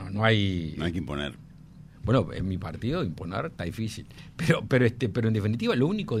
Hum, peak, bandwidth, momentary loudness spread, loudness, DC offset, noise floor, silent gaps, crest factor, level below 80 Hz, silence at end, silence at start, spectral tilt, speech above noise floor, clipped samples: none; -6 dBFS; 13.5 kHz; 11 LU; -28 LUFS; under 0.1%; -48 dBFS; none; 20 dB; -48 dBFS; 0 s; 0 s; -7 dB/octave; 22 dB; under 0.1%